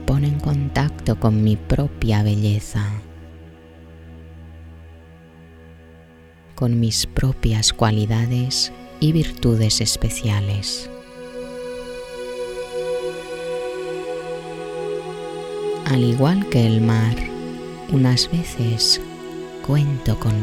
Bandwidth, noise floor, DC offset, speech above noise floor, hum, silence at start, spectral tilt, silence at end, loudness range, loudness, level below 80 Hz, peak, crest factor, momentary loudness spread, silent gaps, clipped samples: 15 kHz; -46 dBFS; under 0.1%; 28 dB; none; 0 s; -5 dB/octave; 0 s; 9 LU; -21 LUFS; -34 dBFS; -2 dBFS; 20 dB; 16 LU; none; under 0.1%